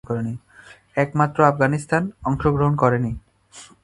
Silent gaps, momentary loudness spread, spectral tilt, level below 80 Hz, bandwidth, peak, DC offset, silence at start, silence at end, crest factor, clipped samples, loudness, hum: none; 12 LU; -8 dB/octave; -44 dBFS; 11.5 kHz; 0 dBFS; under 0.1%; 0.1 s; 0.2 s; 22 dB; under 0.1%; -21 LUFS; none